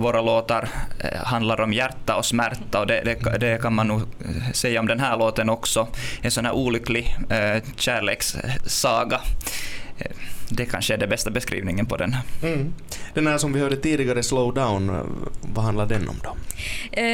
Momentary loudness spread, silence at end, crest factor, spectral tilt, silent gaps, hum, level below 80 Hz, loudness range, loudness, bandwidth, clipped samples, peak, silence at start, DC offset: 10 LU; 0 s; 18 dB; -4.5 dB/octave; none; none; -36 dBFS; 3 LU; -23 LUFS; 18 kHz; under 0.1%; -6 dBFS; 0 s; under 0.1%